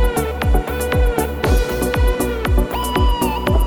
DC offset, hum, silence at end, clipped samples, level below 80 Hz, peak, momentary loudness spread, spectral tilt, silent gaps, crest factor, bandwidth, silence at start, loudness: under 0.1%; none; 0 s; under 0.1%; -20 dBFS; -2 dBFS; 2 LU; -5.5 dB/octave; none; 14 dB; over 20 kHz; 0 s; -19 LUFS